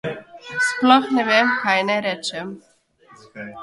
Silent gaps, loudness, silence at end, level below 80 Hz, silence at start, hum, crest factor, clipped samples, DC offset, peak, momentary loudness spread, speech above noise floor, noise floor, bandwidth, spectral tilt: none; -18 LUFS; 0 s; -66 dBFS; 0.05 s; none; 20 dB; under 0.1%; under 0.1%; 0 dBFS; 20 LU; 33 dB; -52 dBFS; 11.5 kHz; -3.5 dB/octave